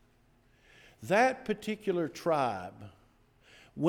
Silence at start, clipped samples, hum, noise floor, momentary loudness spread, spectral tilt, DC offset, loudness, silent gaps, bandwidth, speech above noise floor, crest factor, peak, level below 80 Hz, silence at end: 1 s; under 0.1%; none; -66 dBFS; 22 LU; -5.5 dB/octave; under 0.1%; -31 LUFS; none; 18.5 kHz; 35 dB; 18 dB; -14 dBFS; -68 dBFS; 0 s